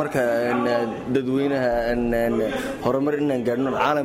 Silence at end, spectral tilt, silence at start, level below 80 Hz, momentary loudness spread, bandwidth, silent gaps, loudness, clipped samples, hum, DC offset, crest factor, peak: 0 s; -6.5 dB/octave; 0 s; -44 dBFS; 3 LU; 16 kHz; none; -23 LUFS; under 0.1%; none; under 0.1%; 14 dB; -8 dBFS